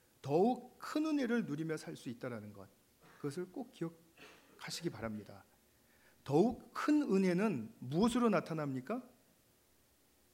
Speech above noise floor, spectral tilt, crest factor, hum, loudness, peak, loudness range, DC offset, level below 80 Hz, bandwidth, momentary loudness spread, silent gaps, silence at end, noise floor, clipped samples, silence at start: 35 dB; -6.5 dB/octave; 20 dB; none; -37 LUFS; -18 dBFS; 12 LU; under 0.1%; -70 dBFS; 16 kHz; 15 LU; none; 1.3 s; -71 dBFS; under 0.1%; 0.25 s